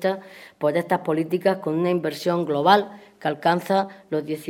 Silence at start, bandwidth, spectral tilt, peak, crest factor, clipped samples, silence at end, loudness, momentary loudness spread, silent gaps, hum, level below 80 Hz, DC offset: 0 s; 17 kHz; -6 dB/octave; -2 dBFS; 22 dB; under 0.1%; 0 s; -23 LUFS; 10 LU; none; none; -72 dBFS; under 0.1%